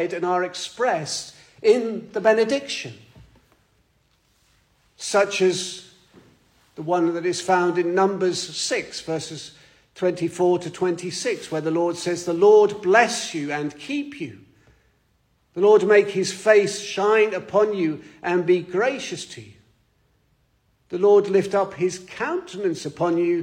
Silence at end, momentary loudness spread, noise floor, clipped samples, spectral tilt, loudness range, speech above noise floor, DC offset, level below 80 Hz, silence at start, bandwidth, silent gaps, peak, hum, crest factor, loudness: 0 s; 13 LU; -65 dBFS; under 0.1%; -4 dB/octave; 7 LU; 44 dB; under 0.1%; -66 dBFS; 0 s; 11.5 kHz; none; -4 dBFS; none; 20 dB; -21 LUFS